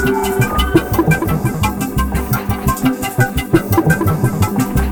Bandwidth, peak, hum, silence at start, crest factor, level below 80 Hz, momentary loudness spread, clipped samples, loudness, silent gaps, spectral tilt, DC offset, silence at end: over 20 kHz; 0 dBFS; none; 0 s; 14 dB; -24 dBFS; 4 LU; under 0.1%; -16 LUFS; none; -6 dB/octave; under 0.1%; 0 s